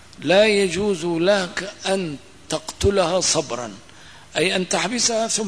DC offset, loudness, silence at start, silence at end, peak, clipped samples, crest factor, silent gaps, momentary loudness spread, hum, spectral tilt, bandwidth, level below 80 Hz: 0.3%; -20 LUFS; 0.2 s; 0 s; -6 dBFS; under 0.1%; 16 dB; none; 12 LU; none; -3 dB/octave; 11 kHz; -44 dBFS